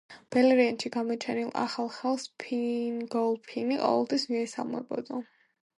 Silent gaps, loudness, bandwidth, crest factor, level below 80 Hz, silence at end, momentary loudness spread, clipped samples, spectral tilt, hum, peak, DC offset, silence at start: none; -29 LUFS; 11.5 kHz; 18 dB; -78 dBFS; 0.55 s; 11 LU; under 0.1%; -4.5 dB/octave; none; -12 dBFS; under 0.1%; 0.1 s